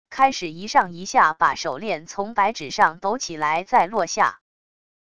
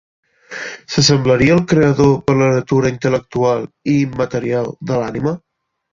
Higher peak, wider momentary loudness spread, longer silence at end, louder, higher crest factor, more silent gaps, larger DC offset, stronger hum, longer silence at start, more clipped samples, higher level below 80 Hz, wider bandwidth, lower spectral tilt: about the same, -2 dBFS vs 0 dBFS; about the same, 8 LU vs 10 LU; first, 0.75 s vs 0.55 s; second, -21 LUFS vs -15 LUFS; about the same, 20 dB vs 16 dB; neither; first, 0.4% vs under 0.1%; neither; second, 0.1 s vs 0.5 s; neither; second, -58 dBFS vs -44 dBFS; first, 11 kHz vs 7.6 kHz; second, -3 dB/octave vs -5.5 dB/octave